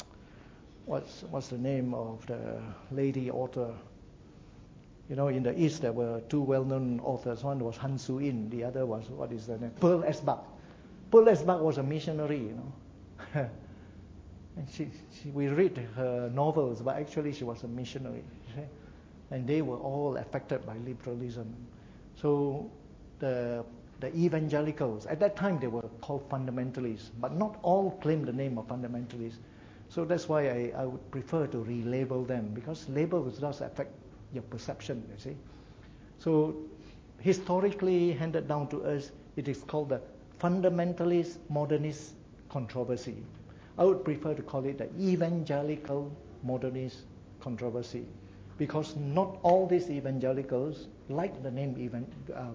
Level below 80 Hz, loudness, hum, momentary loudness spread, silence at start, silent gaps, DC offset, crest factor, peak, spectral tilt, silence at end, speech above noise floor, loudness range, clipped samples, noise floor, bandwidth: -60 dBFS; -32 LUFS; none; 17 LU; 0 s; none; under 0.1%; 24 dB; -8 dBFS; -8 dB/octave; 0 s; 22 dB; 8 LU; under 0.1%; -53 dBFS; 7.8 kHz